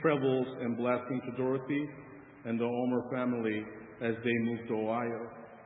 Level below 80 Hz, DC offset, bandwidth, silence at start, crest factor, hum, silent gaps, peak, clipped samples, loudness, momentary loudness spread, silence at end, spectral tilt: -72 dBFS; under 0.1%; 3.9 kHz; 0 s; 18 dB; none; none; -16 dBFS; under 0.1%; -33 LUFS; 11 LU; 0 s; -4 dB/octave